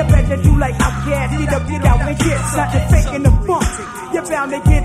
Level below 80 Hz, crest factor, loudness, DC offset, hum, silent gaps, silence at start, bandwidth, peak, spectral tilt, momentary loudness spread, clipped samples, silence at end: -18 dBFS; 14 dB; -16 LUFS; under 0.1%; none; none; 0 s; 15 kHz; 0 dBFS; -6 dB/octave; 6 LU; under 0.1%; 0 s